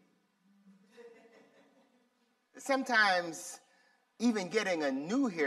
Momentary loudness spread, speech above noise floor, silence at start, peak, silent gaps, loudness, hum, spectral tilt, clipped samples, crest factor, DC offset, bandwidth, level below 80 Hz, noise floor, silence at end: 18 LU; 43 dB; 1 s; -14 dBFS; none; -31 LUFS; none; -3.5 dB/octave; under 0.1%; 20 dB; under 0.1%; 14 kHz; -86 dBFS; -75 dBFS; 0 s